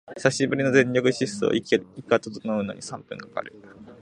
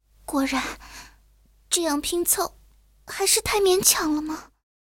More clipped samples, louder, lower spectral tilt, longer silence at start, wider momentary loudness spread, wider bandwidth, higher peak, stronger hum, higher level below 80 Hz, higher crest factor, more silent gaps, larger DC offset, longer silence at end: neither; about the same, -24 LUFS vs -22 LUFS; first, -5 dB/octave vs -1.5 dB/octave; second, 0.1 s vs 0.3 s; second, 15 LU vs 18 LU; second, 11 kHz vs 17.5 kHz; about the same, -2 dBFS vs -4 dBFS; neither; second, -64 dBFS vs -50 dBFS; about the same, 22 dB vs 22 dB; neither; neither; second, 0.1 s vs 0.45 s